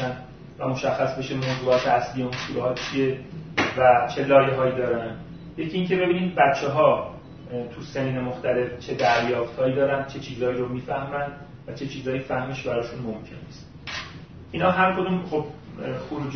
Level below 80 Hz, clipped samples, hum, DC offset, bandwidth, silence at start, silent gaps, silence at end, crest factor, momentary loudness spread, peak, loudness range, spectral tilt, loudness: -52 dBFS; under 0.1%; none; 0.1%; 6.6 kHz; 0 s; none; 0 s; 20 dB; 16 LU; -4 dBFS; 7 LU; -6 dB/octave; -24 LUFS